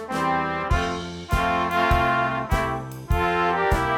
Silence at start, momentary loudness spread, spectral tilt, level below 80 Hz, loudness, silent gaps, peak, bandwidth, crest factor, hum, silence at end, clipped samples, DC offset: 0 s; 7 LU; -5.5 dB/octave; -32 dBFS; -23 LUFS; none; -8 dBFS; 18 kHz; 14 dB; none; 0 s; under 0.1%; under 0.1%